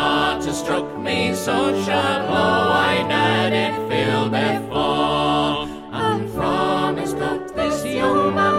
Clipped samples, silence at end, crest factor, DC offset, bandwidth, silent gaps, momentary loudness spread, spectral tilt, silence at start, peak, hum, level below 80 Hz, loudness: under 0.1%; 0 s; 14 dB; under 0.1%; 16 kHz; none; 6 LU; -5 dB/octave; 0 s; -6 dBFS; none; -46 dBFS; -20 LUFS